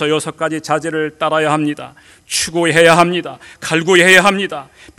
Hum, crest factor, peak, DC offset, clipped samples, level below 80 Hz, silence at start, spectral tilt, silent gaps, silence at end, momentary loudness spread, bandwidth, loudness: none; 14 dB; 0 dBFS; under 0.1%; 0.4%; -52 dBFS; 0 s; -3.5 dB/octave; none; 0.35 s; 14 LU; over 20 kHz; -13 LUFS